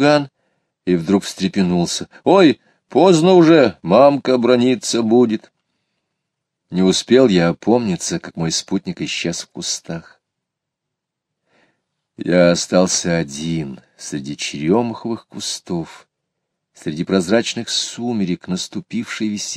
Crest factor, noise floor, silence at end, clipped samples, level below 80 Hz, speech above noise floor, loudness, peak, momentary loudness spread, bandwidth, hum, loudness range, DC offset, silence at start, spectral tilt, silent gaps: 18 dB; -80 dBFS; 0 s; under 0.1%; -56 dBFS; 64 dB; -17 LUFS; 0 dBFS; 14 LU; 15 kHz; none; 10 LU; under 0.1%; 0 s; -5 dB/octave; none